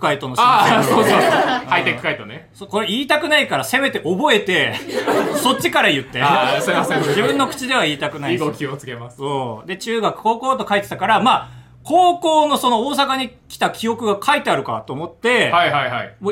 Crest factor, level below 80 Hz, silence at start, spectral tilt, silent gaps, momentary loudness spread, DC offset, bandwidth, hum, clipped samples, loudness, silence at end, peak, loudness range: 16 dB; -56 dBFS; 0 s; -4 dB/octave; none; 11 LU; under 0.1%; 17 kHz; none; under 0.1%; -17 LUFS; 0 s; 0 dBFS; 4 LU